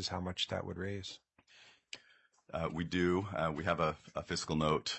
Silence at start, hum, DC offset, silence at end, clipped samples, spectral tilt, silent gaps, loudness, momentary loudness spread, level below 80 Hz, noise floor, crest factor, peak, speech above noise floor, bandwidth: 0 s; none; under 0.1%; 0 s; under 0.1%; -5 dB/octave; none; -36 LUFS; 18 LU; -62 dBFS; -68 dBFS; 22 dB; -16 dBFS; 32 dB; 8.4 kHz